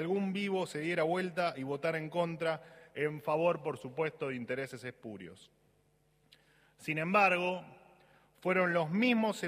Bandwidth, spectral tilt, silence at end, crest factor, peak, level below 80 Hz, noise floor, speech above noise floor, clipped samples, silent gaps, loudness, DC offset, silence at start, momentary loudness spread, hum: 15.5 kHz; -6 dB/octave; 0 s; 20 dB; -14 dBFS; -78 dBFS; -71 dBFS; 38 dB; under 0.1%; none; -33 LUFS; under 0.1%; 0 s; 15 LU; none